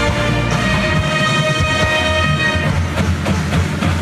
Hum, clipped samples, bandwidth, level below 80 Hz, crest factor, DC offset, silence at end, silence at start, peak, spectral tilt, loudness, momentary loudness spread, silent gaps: none; under 0.1%; 13.5 kHz; -28 dBFS; 12 dB; under 0.1%; 0 s; 0 s; -4 dBFS; -5 dB/octave; -15 LUFS; 3 LU; none